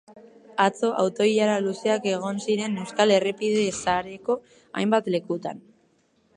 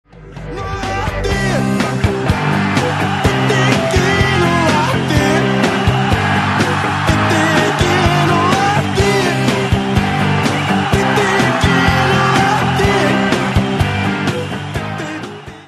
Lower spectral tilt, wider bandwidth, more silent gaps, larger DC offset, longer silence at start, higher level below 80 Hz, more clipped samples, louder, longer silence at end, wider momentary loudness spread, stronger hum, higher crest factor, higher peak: about the same, -4.5 dB/octave vs -5.5 dB/octave; second, 11 kHz vs 13 kHz; neither; neither; about the same, 0.1 s vs 0.15 s; second, -64 dBFS vs -30 dBFS; neither; second, -24 LUFS vs -14 LUFS; first, 0.75 s vs 0 s; about the same, 10 LU vs 8 LU; neither; about the same, 18 dB vs 14 dB; second, -6 dBFS vs 0 dBFS